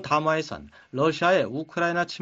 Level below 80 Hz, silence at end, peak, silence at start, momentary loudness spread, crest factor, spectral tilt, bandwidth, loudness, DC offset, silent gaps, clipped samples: -60 dBFS; 0.05 s; -8 dBFS; 0 s; 14 LU; 18 dB; -5.5 dB/octave; 8 kHz; -24 LUFS; under 0.1%; none; under 0.1%